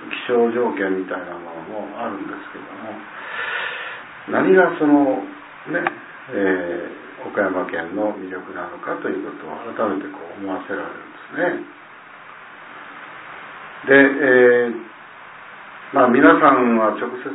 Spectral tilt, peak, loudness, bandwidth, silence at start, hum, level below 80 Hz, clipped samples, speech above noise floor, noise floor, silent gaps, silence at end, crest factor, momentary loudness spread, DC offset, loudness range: -9.5 dB/octave; 0 dBFS; -19 LUFS; 4 kHz; 0 s; none; -64 dBFS; under 0.1%; 23 dB; -41 dBFS; none; 0 s; 20 dB; 24 LU; under 0.1%; 12 LU